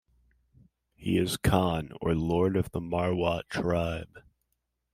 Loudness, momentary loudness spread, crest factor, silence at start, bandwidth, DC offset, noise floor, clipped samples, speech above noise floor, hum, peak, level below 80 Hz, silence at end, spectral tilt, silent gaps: -29 LUFS; 7 LU; 22 dB; 1 s; 16 kHz; under 0.1%; -80 dBFS; under 0.1%; 52 dB; none; -8 dBFS; -48 dBFS; 0.75 s; -6 dB/octave; none